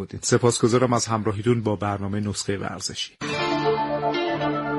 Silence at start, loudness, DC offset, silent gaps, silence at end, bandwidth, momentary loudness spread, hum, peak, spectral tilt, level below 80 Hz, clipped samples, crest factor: 0 s; -23 LUFS; under 0.1%; none; 0 s; 11.5 kHz; 8 LU; none; -4 dBFS; -5 dB/octave; -56 dBFS; under 0.1%; 18 dB